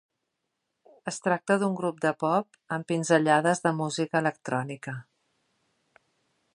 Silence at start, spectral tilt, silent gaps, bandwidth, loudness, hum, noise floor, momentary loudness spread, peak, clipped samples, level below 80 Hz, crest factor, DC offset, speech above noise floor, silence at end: 1.05 s; -5 dB/octave; none; 11.5 kHz; -27 LUFS; none; -81 dBFS; 14 LU; -8 dBFS; under 0.1%; -78 dBFS; 22 dB; under 0.1%; 55 dB; 1.5 s